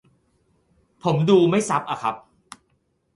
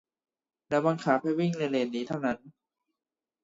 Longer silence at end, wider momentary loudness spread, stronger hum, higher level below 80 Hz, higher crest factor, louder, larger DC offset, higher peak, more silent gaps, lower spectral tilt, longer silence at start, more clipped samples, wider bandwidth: about the same, 1 s vs 0.95 s; first, 12 LU vs 6 LU; neither; first, -62 dBFS vs -72 dBFS; about the same, 18 dB vs 20 dB; first, -21 LUFS vs -29 LUFS; neither; first, -6 dBFS vs -10 dBFS; neither; about the same, -6 dB/octave vs -7 dB/octave; first, 1.05 s vs 0.7 s; neither; first, 11.5 kHz vs 7.8 kHz